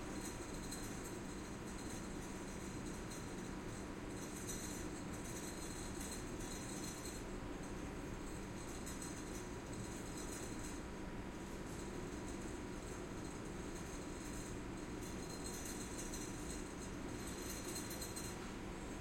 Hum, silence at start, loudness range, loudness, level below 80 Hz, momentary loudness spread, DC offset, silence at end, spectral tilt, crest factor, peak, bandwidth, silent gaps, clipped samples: none; 0 s; 2 LU; -47 LUFS; -54 dBFS; 3 LU; under 0.1%; 0 s; -4 dB/octave; 14 dB; -32 dBFS; 16.5 kHz; none; under 0.1%